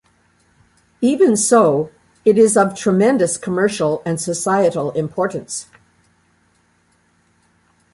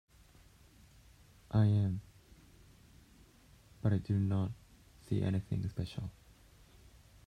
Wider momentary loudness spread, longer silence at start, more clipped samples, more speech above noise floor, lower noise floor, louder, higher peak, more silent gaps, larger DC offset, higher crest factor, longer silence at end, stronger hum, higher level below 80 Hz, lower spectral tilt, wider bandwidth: second, 9 LU vs 14 LU; second, 1 s vs 1.5 s; neither; first, 44 dB vs 29 dB; about the same, -59 dBFS vs -62 dBFS; first, -16 LUFS vs -35 LUFS; first, -2 dBFS vs -18 dBFS; neither; neither; about the same, 16 dB vs 18 dB; first, 2.3 s vs 1.15 s; neither; about the same, -58 dBFS vs -60 dBFS; second, -5 dB/octave vs -8.5 dB/octave; first, 11.5 kHz vs 9.8 kHz